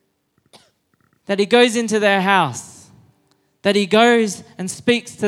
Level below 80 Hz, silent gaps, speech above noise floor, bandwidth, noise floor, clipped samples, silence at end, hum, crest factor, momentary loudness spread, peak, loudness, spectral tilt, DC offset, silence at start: -64 dBFS; none; 48 dB; 14 kHz; -65 dBFS; under 0.1%; 0 s; none; 18 dB; 11 LU; 0 dBFS; -17 LUFS; -4 dB/octave; under 0.1%; 1.3 s